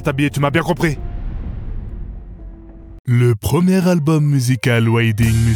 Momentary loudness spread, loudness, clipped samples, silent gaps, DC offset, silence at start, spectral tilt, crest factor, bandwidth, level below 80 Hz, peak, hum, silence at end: 18 LU; -16 LUFS; under 0.1%; 2.99-3.04 s; under 0.1%; 0 s; -6.5 dB/octave; 12 dB; 18.5 kHz; -30 dBFS; -4 dBFS; none; 0 s